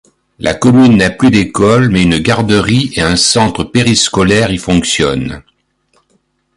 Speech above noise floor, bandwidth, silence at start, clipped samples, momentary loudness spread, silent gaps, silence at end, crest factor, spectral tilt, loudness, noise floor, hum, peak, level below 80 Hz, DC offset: 49 dB; 11.5 kHz; 0.4 s; under 0.1%; 6 LU; none; 1.2 s; 10 dB; -4.5 dB/octave; -10 LUFS; -58 dBFS; none; 0 dBFS; -32 dBFS; under 0.1%